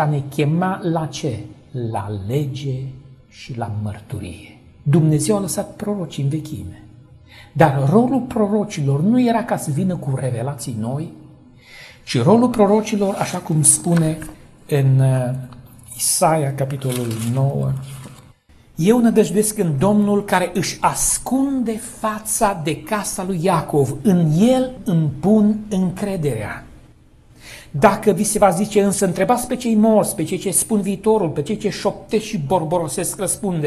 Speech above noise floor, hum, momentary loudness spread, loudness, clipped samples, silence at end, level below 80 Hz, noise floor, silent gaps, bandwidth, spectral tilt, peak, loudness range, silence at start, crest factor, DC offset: 31 dB; none; 14 LU; -18 LUFS; under 0.1%; 0 s; -46 dBFS; -49 dBFS; none; 14 kHz; -5.5 dB/octave; 0 dBFS; 5 LU; 0 s; 18 dB; under 0.1%